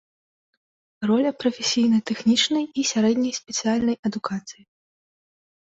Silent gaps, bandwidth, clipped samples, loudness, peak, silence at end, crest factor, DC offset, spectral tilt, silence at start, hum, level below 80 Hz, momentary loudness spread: 3.99-4.03 s; 8 kHz; under 0.1%; -22 LUFS; -8 dBFS; 1.25 s; 16 dB; under 0.1%; -3.5 dB/octave; 1 s; none; -64 dBFS; 10 LU